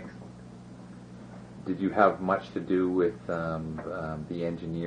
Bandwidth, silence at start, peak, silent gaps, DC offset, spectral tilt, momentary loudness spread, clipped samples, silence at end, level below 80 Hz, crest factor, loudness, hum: 9.8 kHz; 0 s; -8 dBFS; none; under 0.1%; -8.5 dB/octave; 23 LU; under 0.1%; 0 s; -58 dBFS; 22 dB; -29 LUFS; 60 Hz at -55 dBFS